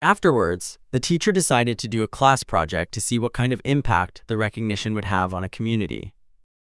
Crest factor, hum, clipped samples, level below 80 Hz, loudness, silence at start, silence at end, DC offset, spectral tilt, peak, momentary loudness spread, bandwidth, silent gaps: 20 dB; none; under 0.1%; -44 dBFS; -22 LUFS; 0 s; 0.55 s; under 0.1%; -5 dB/octave; -2 dBFS; 8 LU; 12 kHz; none